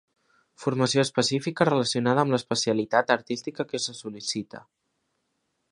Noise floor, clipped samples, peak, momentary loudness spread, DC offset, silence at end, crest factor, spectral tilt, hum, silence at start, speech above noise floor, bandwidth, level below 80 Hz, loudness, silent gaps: -76 dBFS; under 0.1%; -4 dBFS; 9 LU; under 0.1%; 1.1 s; 22 dB; -4.5 dB/octave; none; 0.6 s; 51 dB; 11.5 kHz; -68 dBFS; -25 LUFS; none